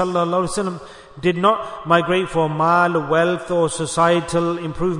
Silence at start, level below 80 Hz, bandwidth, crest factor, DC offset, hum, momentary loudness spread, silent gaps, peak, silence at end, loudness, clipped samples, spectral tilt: 0 s; -46 dBFS; 11 kHz; 16 dB; under 0.1%; none; 7 LU; none; -2 dBFS; 0 s; -19 LUFS; under 0.1%; -5.5 dB/octave